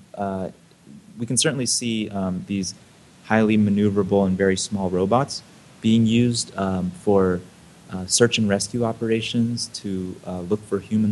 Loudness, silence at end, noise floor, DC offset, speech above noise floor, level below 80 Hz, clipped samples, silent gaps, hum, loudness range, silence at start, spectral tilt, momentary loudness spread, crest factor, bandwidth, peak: -22 LUFS; 0 s; -46 dBFS; under 0.1%; 25 dB; -56 dBFS; under 0.1%; none; none; 3 LU; 0.15 s; -4.5 dB/octave; 11 LU; 20 dB; 12.5 kHz; -2 dBFS